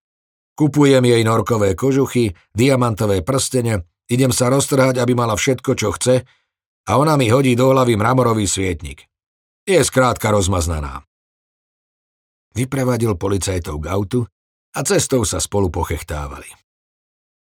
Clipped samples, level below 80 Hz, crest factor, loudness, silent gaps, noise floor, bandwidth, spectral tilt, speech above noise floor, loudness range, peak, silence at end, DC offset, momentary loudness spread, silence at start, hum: under 0.1%; -40 dBFS; 16 dB; -17 LUFS; 6.66-6.84 s, 9.26-9.67 s, 11.07-12.51 s, 14.32-14.72 s; under -90 dBFS; 18.5 kHz; -5 dB/octave; over 74 dB; 6 LU; -2 dBFS; 1.05 s; under 0.1%; 11 LU; 0.6 s; none